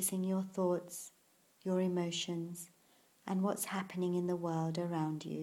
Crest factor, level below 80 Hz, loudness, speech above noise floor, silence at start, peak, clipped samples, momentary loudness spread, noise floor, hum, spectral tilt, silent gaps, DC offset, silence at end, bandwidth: 14 dB; -80 dBFS; -37 LUFS; 32 dB; 0 s; -22 dBFS; under 0.1%; 12 LU; -69 dBFS; none; -5 dB/octave; none; under 0.1%; 0 s; 16.5 kHz